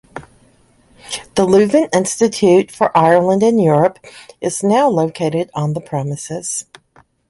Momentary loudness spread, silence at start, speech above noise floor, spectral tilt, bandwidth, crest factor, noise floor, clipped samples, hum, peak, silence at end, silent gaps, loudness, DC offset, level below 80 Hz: 12 LU; 0.15 s; 38 dB; -5.5 dB/octave; 11.5 kHz; 16 dB; -53 dBFS; under 0.1%; none; 0 dBFS; 0.65 s; none; -15 LUFS; under 0.1%; -54 dBFS